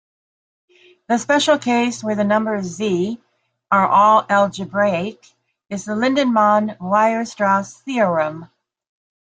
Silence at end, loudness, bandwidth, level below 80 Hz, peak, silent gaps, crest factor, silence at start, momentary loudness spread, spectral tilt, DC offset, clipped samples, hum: 0.8 s; -18 LUFS; 9.4 kHz; -64 dBFS; -2 dBFS; none; 16 dB; 1.1 s; 11 LU; -5 dB/octave; under 0.1%; under 0.1%; none